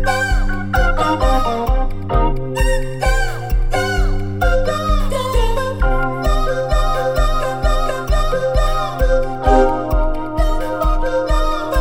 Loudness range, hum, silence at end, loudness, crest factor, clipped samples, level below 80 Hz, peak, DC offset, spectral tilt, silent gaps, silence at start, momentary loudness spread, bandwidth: 1 LU; none; 0 s; -18 LUFS; 14 dB; under 0.1%; -18 dBFS; 0 dBFS; under 0.1%; -5.5 dB/octave; none; 0 s; 4 LU; 16 kHz